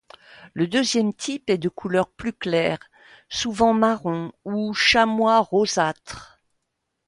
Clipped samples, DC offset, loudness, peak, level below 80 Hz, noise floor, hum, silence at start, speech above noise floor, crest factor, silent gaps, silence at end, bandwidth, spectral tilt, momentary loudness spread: under 0.1%; under 0.1%; -22 LUFS; -4 dBFS; -54 dBFS; -78 dBFS; none; 0.4 s; 56 dB; 18 dB; none; 0.85 s; 11.5 kHz; -4 dB/octave; 12 LU